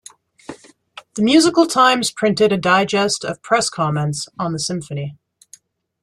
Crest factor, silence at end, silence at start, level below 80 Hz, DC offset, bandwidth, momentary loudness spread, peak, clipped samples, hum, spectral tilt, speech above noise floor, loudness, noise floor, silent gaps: 16 dB; 0.9 s; 0.5 s; -58 dBFS; under 0.1%; 13 kHz; 17 LU; -2 dBFS; under 0.1%; none; -4 dB/octave; 32 dB; -17 LUFS; -49 dBFS; none